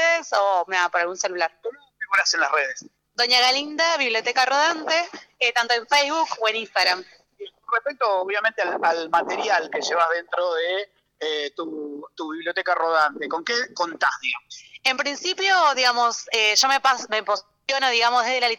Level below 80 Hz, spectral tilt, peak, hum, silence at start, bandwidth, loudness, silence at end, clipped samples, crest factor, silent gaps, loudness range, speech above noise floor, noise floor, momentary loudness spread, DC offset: -74 dBFS; 0.5 dB/octave; -8 dBFS; none; 0 s; 19 kHz; -21 LUFS; 0 s; under 0.1%; 14 dB; none; 5 LU; 20 dB; -42 dBFS; 13 LU; under 0.1%